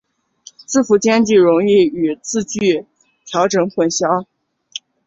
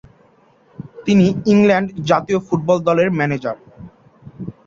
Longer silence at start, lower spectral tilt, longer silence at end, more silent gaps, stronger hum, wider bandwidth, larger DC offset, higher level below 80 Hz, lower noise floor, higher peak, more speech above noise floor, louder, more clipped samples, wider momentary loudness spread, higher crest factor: about the same, 0.7 s vs 0.8 s; second, -4.5 dB/octave vs -7 dB/octave; first, 0.3 s vs 0.15 s; neither; neither; about the same, 8 kHz vs 7.4 kHz; neither; second, -58 dBFS vs -52 dBFS; second, -46 dBFS vs -53 dBFS; about the same, -2 dBFS vs -2 dBFS; second, 31 dB vs 38 dB; about the same, -15 LUFS vs -16 LUFS; neither; second, 11 LU vs 20 LU; about the same, 14 dB vs 16 dB